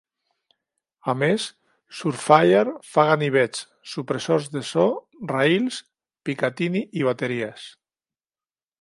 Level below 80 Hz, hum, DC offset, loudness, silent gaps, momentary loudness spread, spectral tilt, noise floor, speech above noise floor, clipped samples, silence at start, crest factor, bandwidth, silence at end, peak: -72 dBFS; none; under 0.1%; -22 LUFS; none; 15 LU; -5.5 dB/octave; under -90 dBFS; over 68 dB; under 0.1%; 1.05 s; 24 dB; 11.5 kHz; 1.1 s; 0 dBFS